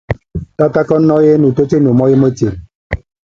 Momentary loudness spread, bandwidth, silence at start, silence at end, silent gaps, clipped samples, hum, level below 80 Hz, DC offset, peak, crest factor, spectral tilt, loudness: 15 LU; 7.4 kHz; 0.1 s; 0.3 s; 2.75-2.90 s; under 0.1%; none; -34 dBFS; under 0.1%; 0 dBFS; 12 dB; -9 dB/octave; -11 LUFS